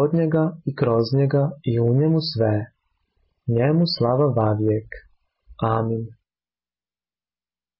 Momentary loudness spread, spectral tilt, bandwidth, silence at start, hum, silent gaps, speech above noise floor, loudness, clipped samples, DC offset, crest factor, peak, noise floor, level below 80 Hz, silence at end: 10 LU; -12 dB/octave; 5.8 kHz; 0 s; 60 Hz at -45 dBFS; none; over 70 dB; -21 LUFS; under 0.1%; under 0.1%; 12 dB; -10 dBFS; under -90 dBFS; -52 dBFS; 1.65 s